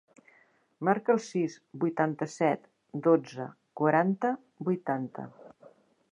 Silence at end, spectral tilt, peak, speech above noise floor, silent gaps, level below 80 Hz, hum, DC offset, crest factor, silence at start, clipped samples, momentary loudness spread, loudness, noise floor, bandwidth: 0.65 s; -7 dB/octave; -10 dBFS; 36 dB; none; -82 dBFS; none; under 0.1%; 22 dB; 0.8 s; under 0.1%; 15 LU; -29 LUFS; -65 dBFS; 10.5 kHz